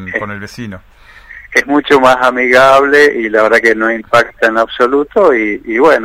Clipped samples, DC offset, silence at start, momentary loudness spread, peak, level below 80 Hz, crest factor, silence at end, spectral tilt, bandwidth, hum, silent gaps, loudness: 0.7%; under 0.1%; 0 s; 13 LU; 0 dBFS; -44 dBFS; 10 dB; 0 s; -4.5 dB/octave; 16 kHz; none; none; -10 LUFS